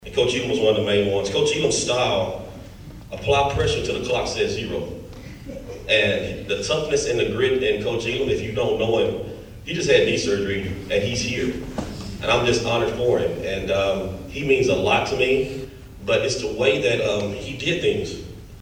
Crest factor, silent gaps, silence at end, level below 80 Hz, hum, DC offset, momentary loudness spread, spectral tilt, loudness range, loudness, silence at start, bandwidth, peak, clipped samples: 18 dB; none; 0 s; -42 dBFS; none; under 0.1%; 15 LU; -4 dB/octave; 2 LU; -22 LUFS; 0 s; 16 kHz; -4 dBFS; under 0.1%